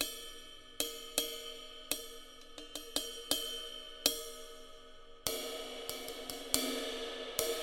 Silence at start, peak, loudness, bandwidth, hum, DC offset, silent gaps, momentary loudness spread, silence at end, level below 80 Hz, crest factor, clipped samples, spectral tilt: 0 s; -6 dBFS; -38 LUFS; 17 kHz; none; under 0.1%; none; 17 LU; 0 s; -58 dBFS; 34 dB; under 0.1%; -0.5 dB/octave